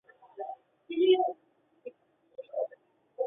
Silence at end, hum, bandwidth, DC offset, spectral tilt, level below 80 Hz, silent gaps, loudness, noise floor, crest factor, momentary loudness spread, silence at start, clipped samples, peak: 0 s; none; 3.8 kHz; under 0.1%; -7 dB/octave; -84 dBFS; none; -30 LUFS; -69 dBFS; 20 dB; 24 LU; 0.35 s; under 0.1%; -12 dBFS